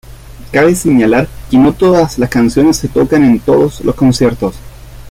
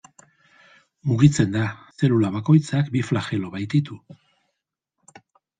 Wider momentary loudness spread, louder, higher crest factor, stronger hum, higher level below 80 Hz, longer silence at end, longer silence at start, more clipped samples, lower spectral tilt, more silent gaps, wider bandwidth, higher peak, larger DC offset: second, 5 LU vs 11 LU; first, -10 LUFS vs -21 LUFS; second, 10 dB vs 20 dB; neither; first, -32 dBFS vs -56 dBFS; second, 0 s vs 1.6 s; second, 0.1 s vs 1.05 s; neither; about the same, -6 dB/octave vs -7 dB/octave; neither; first, 16 kHz vs 9.4 kHz; about the same, -2 dBFS vs -2 dBFS; neither